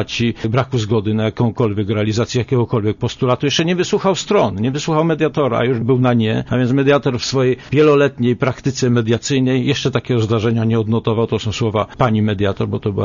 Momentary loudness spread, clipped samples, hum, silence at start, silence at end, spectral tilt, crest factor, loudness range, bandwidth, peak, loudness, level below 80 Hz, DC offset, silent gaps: 5 LU; under 0.1%; none; 0 s; 0 s; -6 dB/octave; 14 dB; 2 LU; 7.4 kHz; -2 dBFS; -17 LUFS; -46 dBFS; under 0.1%; none